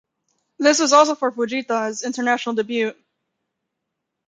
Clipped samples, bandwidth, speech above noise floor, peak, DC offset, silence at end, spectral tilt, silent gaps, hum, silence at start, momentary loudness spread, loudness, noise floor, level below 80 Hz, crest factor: under 0.1%; 9.6 kHz; 61 dB; -2 dBFS; under 0.1%; 1.35 s; -2 dB/octave; none; none; 0.6 s; 10 LU; -19 LUFS; -80 dBFS; -74 dBFS; 20 dB